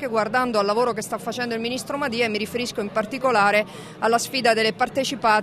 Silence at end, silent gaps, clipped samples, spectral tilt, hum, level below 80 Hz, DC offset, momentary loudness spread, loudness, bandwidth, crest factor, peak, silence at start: 0 s; none; under 0.1%; -3.5 dB/octave; none; -60 dBFS; under 0.1%; 8 LU; -22 LUFS; 15.5 kHz; 16 dB; -6 dBFS; 0 s